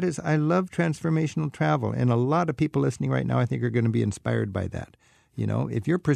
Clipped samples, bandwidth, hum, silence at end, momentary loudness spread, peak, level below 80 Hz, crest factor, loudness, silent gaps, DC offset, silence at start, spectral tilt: under 0.1%; 11 kHz; none; 0 s; 7 LU; -10 dBFS; -54 dBFS; 14 dB; -25 LUFS; none; under 0.1%; 0 s; -7.5 dB/octave